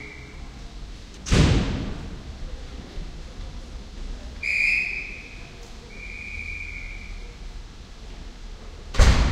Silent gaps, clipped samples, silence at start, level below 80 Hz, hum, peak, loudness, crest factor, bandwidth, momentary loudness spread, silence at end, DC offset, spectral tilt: none; under 0.1%; 0 s; -30 dBFS; none; -4 dBFS; -24 LUFS; 24 dB; 12 kHz; 22 LU; 0 s; under 0.1%; -5 dB/octave